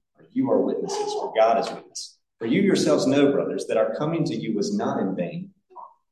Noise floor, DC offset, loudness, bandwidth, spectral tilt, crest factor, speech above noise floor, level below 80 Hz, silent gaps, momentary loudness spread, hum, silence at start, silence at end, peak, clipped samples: -46 dBFS; under 0.1%; -23 LUFS; 12.5 kHz; -5.5 dB/octave; 16 dB; 23 dB; -72 dBFS; none; 14 LU; none; 0.35 s; 0.25 s; -8 dBFS; under 0.1%